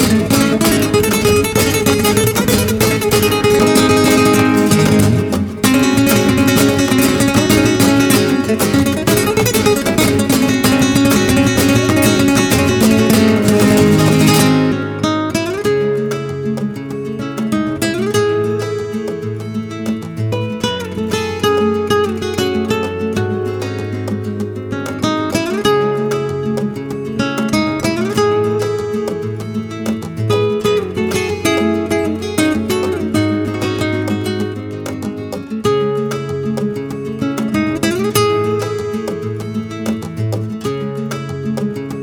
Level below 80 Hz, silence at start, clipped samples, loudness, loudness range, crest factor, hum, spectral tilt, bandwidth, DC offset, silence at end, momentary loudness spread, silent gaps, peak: -38 dBFS; 0 s; under 0.1%; -15 LUFS; 7 LU; 14 dB; none; -5 dB/octave; over 20 kHz; under 0.1%; 0 s; 11 LU; none; 0 dBFS